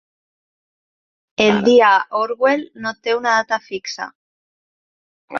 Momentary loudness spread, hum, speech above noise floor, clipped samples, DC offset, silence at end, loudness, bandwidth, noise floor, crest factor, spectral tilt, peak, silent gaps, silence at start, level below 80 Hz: 16 LU; none; over 73 dB; under 0.1%; under 0.1%; 0 s; -16 LUFS; 7.2 kHz; under -90 dBFS; 18 dB; -4 dB/octave; -2 dBFS; 4.15-5.28 s; 1.4 s; -62 dBFS